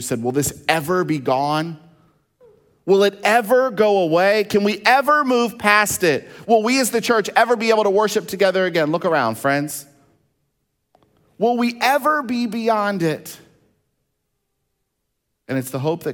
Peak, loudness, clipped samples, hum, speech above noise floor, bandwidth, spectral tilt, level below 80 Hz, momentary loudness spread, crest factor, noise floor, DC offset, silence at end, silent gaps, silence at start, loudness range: 0 dBFS; -18 LUFS; under 0.1%; none; 57 dB; 18 kHz; -4 dB/octave; -60 dBFS; 8 LU; 20 dB; -75 dBFS; under 0.1%; 0 s; none; 0 s; 6 LU